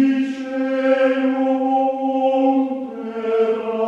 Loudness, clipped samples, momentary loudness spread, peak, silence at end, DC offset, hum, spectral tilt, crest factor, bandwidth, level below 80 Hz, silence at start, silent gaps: -19 LUFS; under 0.1%; 7 LU; -6 dBFS; 0 s; under 0.1%; none; -6 dB/octave; 12 dB; 7 kHz; -68 dBFS; 0 s; none